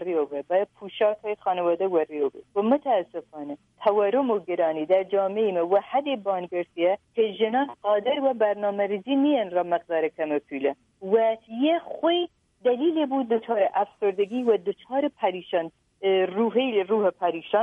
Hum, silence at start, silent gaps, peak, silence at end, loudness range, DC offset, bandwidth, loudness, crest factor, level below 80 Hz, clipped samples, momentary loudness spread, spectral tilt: none; 0 s; none; -8 dBFS; 0 s; 1 LU; under 0.1%; 3.9 kHz; -25 LUFS; 16 dB; -74 dBFS; under 0.1%; 6 LU; -7.5 dB/octave